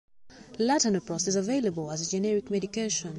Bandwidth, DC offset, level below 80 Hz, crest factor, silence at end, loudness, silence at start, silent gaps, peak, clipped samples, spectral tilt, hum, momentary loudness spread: 11.5 kHz; under 0.1%; -64 dBFS; 16 dB; 0 s; -28 LUFS; 0.15 s; none; -14 dBFS; under 0.1%; -4 dB/octave; none; 6 LU